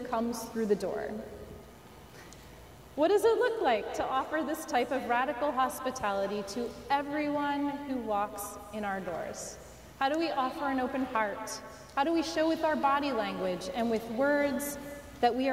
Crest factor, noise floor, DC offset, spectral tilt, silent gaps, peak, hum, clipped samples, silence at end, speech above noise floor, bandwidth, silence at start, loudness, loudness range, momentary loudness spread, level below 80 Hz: 16 dB; -52 dBFS; under 0.1%; -4 dB/octave; none; -16 dBFS; none; under 0.1%; 0 s; 21 dB; 16 kHz; 0 s; -31 LUFS; 4 LU; 17 LU; -60 dBFS